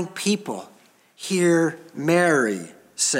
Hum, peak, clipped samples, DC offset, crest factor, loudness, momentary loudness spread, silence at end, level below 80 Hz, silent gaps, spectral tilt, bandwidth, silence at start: none; -6 dBFS; under 0.1%; under 0.1%; 18 dB; -22 LUFS; 16 LU; 0 s; -76 dBFS; none; -4 dB/octave; 16.5 kHz; 0 s